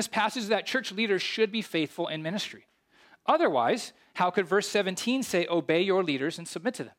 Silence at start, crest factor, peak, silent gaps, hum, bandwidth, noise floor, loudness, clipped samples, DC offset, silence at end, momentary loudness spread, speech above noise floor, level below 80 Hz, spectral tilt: 0 s; 18 dB; -12 dBFS; none; none; 16.5 kHz; -61 dBFS; -28 LUFS; under 0.1%; under 0.1%; 0.1 s; 8 LU; 33 dB; -76 dBFS; -4 dB/octave